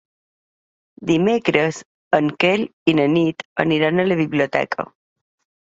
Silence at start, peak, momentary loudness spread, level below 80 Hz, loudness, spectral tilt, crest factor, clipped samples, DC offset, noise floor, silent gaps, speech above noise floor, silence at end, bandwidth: 1 s; -2 dBFS; 9 LU; -60 dBFS; -19 LUFS; -6 dB/octave; 18 dB; under 0.1%; under 0.1%; under -90 dBFS; 1.85-2.11 s, 2.73-2.86 s, 3.45-3.56 s; over 72 dB; 0.75 s; 7.8 kHz